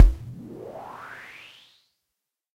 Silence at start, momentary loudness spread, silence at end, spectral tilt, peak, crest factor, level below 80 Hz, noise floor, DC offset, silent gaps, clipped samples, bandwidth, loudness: 0 s; 13 LU; 2.45 s; -7 dB/octave; 0 dBFS; 24 dB; -28 dBFS; -84 dBFS; under 0.1%; none; under 0.1%; 5.2 kHz; -31 LUFS